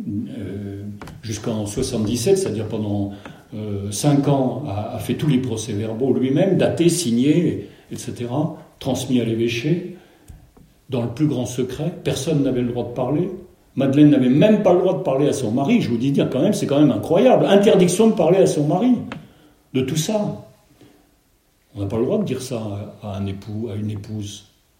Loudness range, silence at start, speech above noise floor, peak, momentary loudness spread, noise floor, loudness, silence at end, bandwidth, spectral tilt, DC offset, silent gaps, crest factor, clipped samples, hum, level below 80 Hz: 9 LU; 0 s; 42 dB; -2 dBFS; 16 LU; -60 dBFS; -20 LUFS; 0.4 s; 16 kHz; -6.5 dB/octave; under 0.1%; none; 18 dB; under 0.1%; none; -52 dBFS